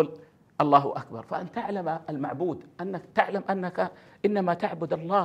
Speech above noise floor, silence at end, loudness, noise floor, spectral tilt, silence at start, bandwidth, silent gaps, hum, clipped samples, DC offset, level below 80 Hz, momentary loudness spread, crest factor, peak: 20 dB; 0 s; -28 LUFS; -48 dBFS; -8 dB/octave; 0 s; 9.4 kHz; none; none; under 0.1%; under 0.1%; -70 dBFS; 13 LU; 22 dB; -4 dBFS